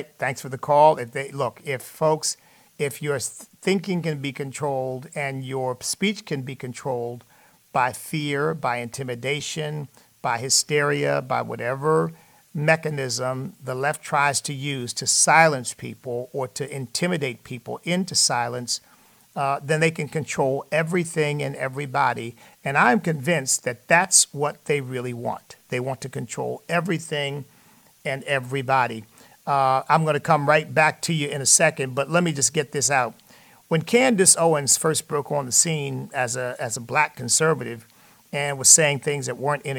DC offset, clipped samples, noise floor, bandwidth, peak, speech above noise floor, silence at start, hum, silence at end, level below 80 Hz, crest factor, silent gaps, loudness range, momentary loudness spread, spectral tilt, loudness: under 0.1%; under 0.1%; -55 dBFS; 19 kHz; -2 dBFS; 32 dB; 0 s; none; 0 s; -68 dBFS; 22 dB; none; 7 LU; 14 LU; -3 dB/octave; -22 LUFS